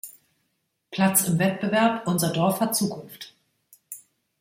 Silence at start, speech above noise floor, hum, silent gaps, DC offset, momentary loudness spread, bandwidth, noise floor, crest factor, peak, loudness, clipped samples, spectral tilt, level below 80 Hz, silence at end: 0.05 s; 52 dB; none; none; under 0.1%; 21 LU; 16.5 kHz; -75 dBFS; 20 dB; -6 dBFS; -23 LUFS; under 0.1%; -4.5 dB/octave; -66 dBFS; 0.4 s